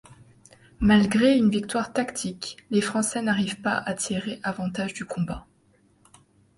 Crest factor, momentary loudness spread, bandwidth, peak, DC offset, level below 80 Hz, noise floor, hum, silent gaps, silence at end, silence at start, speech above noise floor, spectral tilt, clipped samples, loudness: 18 dB; 12 LU; 11.5 kHz; -8 dBFS; under 0.1%; -48 dBFS; -62 dBFS; none; none; 1.15 s; 0.8 s; 38 dB; -4.5 dB/octave; under 0.1%; -25 LUFS